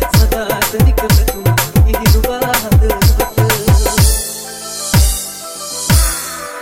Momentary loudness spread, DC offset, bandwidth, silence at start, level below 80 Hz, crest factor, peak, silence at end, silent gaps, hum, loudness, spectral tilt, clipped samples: 10 LU; under 0.1%; 17 kHz; 0 s; -16 dBFS; 12 dB; 0 dBFS; 0 s; none; none; -13 LUFS; -4.5 dB/octave; under 0.1%